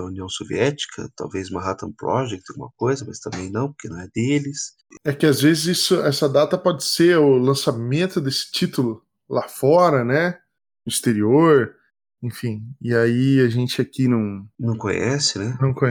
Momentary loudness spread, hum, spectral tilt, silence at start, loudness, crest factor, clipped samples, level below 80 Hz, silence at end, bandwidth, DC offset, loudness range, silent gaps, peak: 14 LU; none; -5 dB/octave; 0 s; -20 LUFS; 16 dB; under 0.1%; -58 dBFS; 0 s; over 20 kHz; under 0.1%; 8 LU; none; -4 dBFS